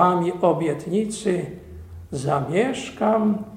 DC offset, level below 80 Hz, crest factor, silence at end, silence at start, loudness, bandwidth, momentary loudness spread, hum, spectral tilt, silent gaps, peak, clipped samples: under 0.1%; -50 dBFS; 18 dB; 0 s; 0 s; -23 LUFS; 14 kHz; 14 LU; none; -6.5 dB/octave; none; -4 dBFS; under 0.1%